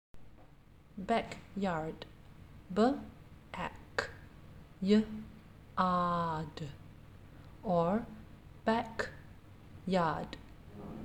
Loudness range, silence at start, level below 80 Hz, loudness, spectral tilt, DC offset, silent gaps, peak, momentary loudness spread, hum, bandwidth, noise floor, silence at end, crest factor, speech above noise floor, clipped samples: 3 LU; 0.15 s; -58 dBFS; -35 LUFS; -7 dB/octave; under 0.1%; none; -16 dBFS; 24 LU; none; 10.5 kHz; -59 dBFS; 0 s; 20 dB; 26 dB; under 0.1%